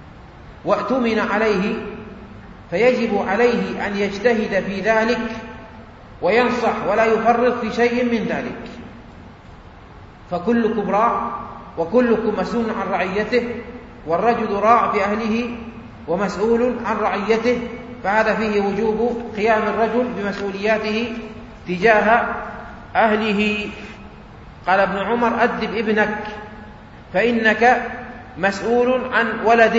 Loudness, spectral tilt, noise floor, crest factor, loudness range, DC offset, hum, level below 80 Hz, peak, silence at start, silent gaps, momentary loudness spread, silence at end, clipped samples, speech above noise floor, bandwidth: -19 LUFS; -6 dB/octave; -41 dBFS; 18 dB; 2 LU; under 0.1%; none; -46 dBFS; 0 dBFS; 0 s; none; 17 LU; 0 s; under 0.1%; 23 dB; 8 kHz